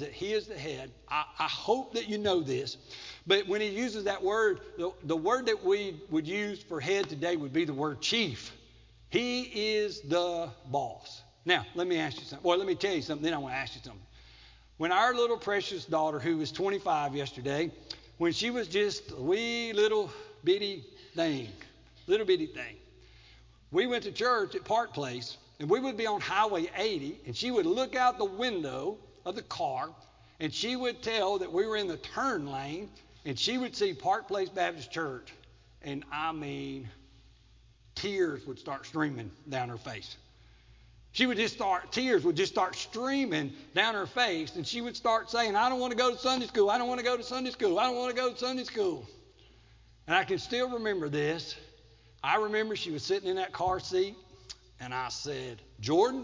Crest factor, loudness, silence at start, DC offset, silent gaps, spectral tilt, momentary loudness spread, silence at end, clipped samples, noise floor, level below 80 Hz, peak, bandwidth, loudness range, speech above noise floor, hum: 22 dB; -31 LUFS; 0 s; under 0.1%; none; -4 dB/octave; 12 LU; 0 s; under 0.1%; -60 dBFS; -62 dBFS; -10 dBFS; 7.6 kHz; 5 LU; 29 dB; none